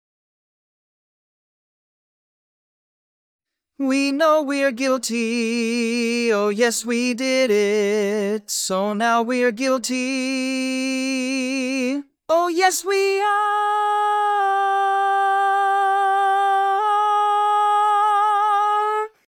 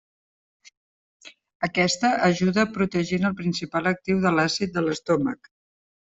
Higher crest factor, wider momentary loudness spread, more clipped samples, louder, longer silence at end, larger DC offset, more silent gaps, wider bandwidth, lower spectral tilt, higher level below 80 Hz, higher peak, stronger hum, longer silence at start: about the same, 18 dB vs 20 dB; about the same, 5 LU vs 6 LU; neither; first, -20 LUFS vs -23 LUFS; second, 0.2 s vs 0.75 s; neither; second, none vs 1.55-1.60 s; first, 19 kHz vs 8 kHz; second, -3 dB/octave vs -5 dB/octave; second, -78 dBFS vs -60 dBFS; first, -2 dBFS vs -6 dBFS; neither; first, 3.8 s vs 1.25 s